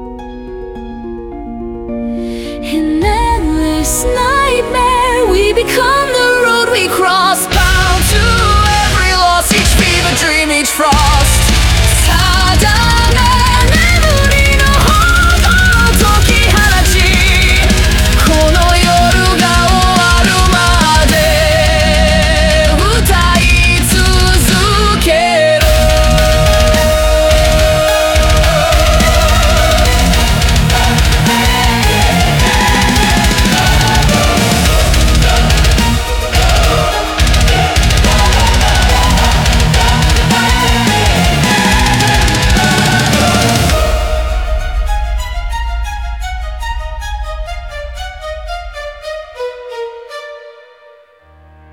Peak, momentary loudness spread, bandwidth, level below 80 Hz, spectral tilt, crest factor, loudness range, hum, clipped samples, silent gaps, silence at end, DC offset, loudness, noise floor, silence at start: 0 dBFS; 14 LU; 18 kHz; -14 dBFS; -4 dB/octave; 10 dB; 10 LU; none; under 0.1%; none; 1.2 s; under 0.1%; -10 LUFS; -43 dBFS; 0 s